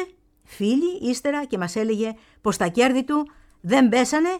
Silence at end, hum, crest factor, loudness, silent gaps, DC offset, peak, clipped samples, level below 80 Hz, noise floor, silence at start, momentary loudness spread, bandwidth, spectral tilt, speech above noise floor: 0 s; none; 18 dB; -22 LUFS; none; under 0.1%; -4 dBFS; under 0.1%; -56 dBFS; -50 dBFS; 0 s; 10 LU; 14.5 kHz; -4.5 dB/octave; 28 dB